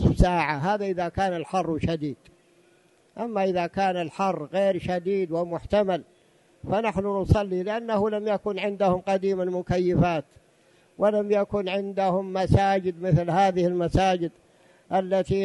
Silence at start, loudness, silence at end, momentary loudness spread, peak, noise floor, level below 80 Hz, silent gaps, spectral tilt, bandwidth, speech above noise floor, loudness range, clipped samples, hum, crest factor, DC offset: 0 s; -25 LUFS; 0 s; 7 LU; -6 dBFS; -61 dBFS; -40 dBFS; none; -7.5 dB/octave; 11.5 kHz; 36 dB; 4 LU; under 0.1%; none; 20 dB; under 0.1%